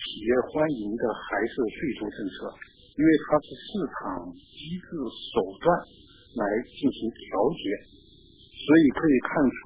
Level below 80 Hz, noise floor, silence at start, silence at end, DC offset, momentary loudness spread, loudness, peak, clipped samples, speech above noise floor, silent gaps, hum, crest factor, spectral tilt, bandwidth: -54 dBFS; -54 dBFS; 0 s; 0 s; under 0.1%; 16 LU; -27 LUFS; -6 dBFS; under 0.1%; 28 dB; none; none; 20 dB; -10 dB/octave; 4 kHz